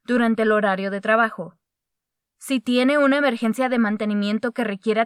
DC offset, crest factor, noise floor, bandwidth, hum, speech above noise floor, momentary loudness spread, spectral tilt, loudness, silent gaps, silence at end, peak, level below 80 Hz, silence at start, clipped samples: under 0.1%; 16 dB; -83 dBFS; 14.5 kHz; none; 62 dB; 8 LU; -5.5 dB/octave; -21 LUFS; none; 0 s; -6 dBFS; -80 dBFS; 0.1 s; under 0.1%